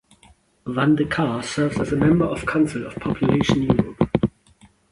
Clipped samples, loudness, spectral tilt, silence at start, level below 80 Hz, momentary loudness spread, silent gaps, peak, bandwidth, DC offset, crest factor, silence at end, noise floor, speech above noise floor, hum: under 0.1%; -21 LUFS; -7 dB/octave; 0.65 s; -42 dBFS; 8 LU; none; -4 dBFS; 11.5 kHz; under 0.1%; 18 dB; 0.65 s; -55 dBFS; 35 dB; none